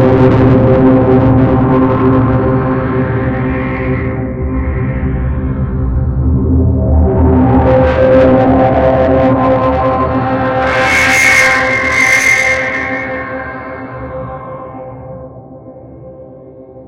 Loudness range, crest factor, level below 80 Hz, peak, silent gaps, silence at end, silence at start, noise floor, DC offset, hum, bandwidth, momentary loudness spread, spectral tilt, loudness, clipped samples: 9 LU; 10 dB; -22 dBFS; 0 dBFS; none; 0 s; 0 s; -33 dBFS; under 0.1%; none; 16 kHz; 16 LU; -6.5 dB/octave; -10 LUFS; under 0.1%